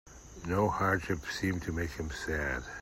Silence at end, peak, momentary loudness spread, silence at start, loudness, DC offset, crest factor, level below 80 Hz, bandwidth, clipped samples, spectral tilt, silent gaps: 0 s; -16 dBFS; 8 LU; 0.05 s; -33 LUFS; under 0.1%; 18 dB; -48 dBFS; 16 kHz; under 0.1%; -5.5 dB/octave; none